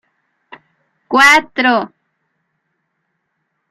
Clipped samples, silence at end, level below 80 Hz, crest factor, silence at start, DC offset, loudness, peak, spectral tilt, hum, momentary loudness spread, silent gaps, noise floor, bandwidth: under 0.1%; 1.85 s; -56 dBFS; 18 dB; 1.1 s; under 0.1%; -11 LUFS; 0 dBFS; -1.5 dB/octave; none; 10 LU; none; -70 dBFS; 16 kHz